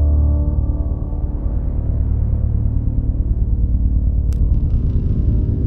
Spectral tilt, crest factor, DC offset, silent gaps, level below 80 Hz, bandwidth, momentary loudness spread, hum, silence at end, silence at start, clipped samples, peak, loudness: -11.5 dB/octave; 12 dB; under 0.1%; none; -18 dBFS; 1.6 kHz; 5 LU; none; 0 s; 0 s; under 0.1%; -4 dBFS; -20 LUFS